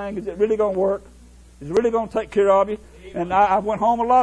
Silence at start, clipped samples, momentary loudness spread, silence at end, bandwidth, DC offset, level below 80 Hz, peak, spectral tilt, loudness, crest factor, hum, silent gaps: 0 s; under 0.1%; 12 LU; 0 s; 11 kHz; under 0.1%; -46 dBFS; -4 dBFS; -6.5 dB/octave; -20 LUFS; 16 dB; none; none